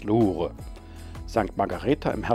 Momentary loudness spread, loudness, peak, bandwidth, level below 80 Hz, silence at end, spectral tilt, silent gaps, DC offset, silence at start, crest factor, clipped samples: 19 LU; -26 LUFS; -6 dBFS; 14 kHz; -42 dBFS; 0 s; -7.5 dB/octave; none; under 0.1%; 0 s; 20 dB; under 0.1%